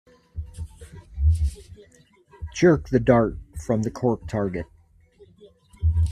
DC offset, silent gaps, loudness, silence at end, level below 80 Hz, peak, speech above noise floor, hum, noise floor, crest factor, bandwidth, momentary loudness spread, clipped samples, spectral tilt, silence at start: under 0.1%; none; -23 LUFS; 0 s; -34 dBFS; -4 dBFS; 31 dB; none; -54 dBFS; 22 dB; 11 kHz; 22 LU; under 0.1%; -7.5 dB/octave; 0.35 s